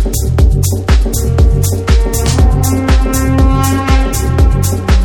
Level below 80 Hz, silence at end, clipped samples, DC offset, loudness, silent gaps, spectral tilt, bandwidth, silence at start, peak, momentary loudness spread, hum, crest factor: -12 dBFS; 0 s; under 0.1%; under 0.1%; -12 LUFS; none; -5.5 dB/octave; 18.5 kHz; 0 s; 0 dBFS; 3 LU; none; 10 dB